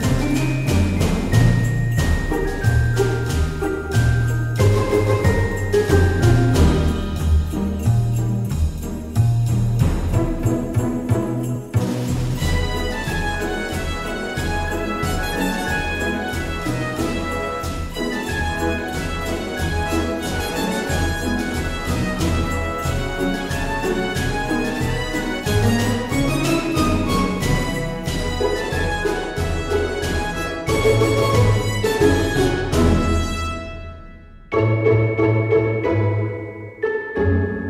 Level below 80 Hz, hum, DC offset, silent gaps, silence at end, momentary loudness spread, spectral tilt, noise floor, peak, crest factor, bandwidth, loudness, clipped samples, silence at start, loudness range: -28 dBFS; none; under 0.1%; none; 0 s; 7 LU; -6 dB/octave; -40 dBFS; -2 dBFS; 16 dB; 16 kHz; -20 LUFS; under 0.1%; 0 s; 5 LU